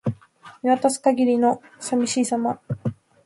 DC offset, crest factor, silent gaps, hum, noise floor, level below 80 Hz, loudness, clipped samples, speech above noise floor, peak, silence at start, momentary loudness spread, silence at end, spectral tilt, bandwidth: under 0.1%; 16 dB; none; none; -48 dBFS; -60 dBFS; -22 LUFS; under 0.1%; 27 dB; -6 dBFS; 0.05 s; 11 LU; 0.3 s; -5.5 dB/octave; 11.5 kHz